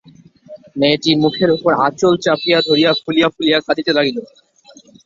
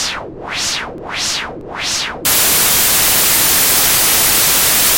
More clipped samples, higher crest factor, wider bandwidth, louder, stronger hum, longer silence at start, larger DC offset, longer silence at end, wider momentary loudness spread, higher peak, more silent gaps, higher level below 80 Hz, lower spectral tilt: neither; about the same, 14 dB vs 14 dB; second, 7.6 kHz vs 17 kHz; second, -15 LUFS vs -10 LUFS; neither; first, 0.5 s vs 0 s; neither; first, 0.8 s vs 0 s; second, 4 LU vs 12 LU; about the same, -2 dBFS vs 0 dBFS; neither; second, -56 dBFS vs -38 dBFS; first, -5 dB/octave vs 0 dB/octave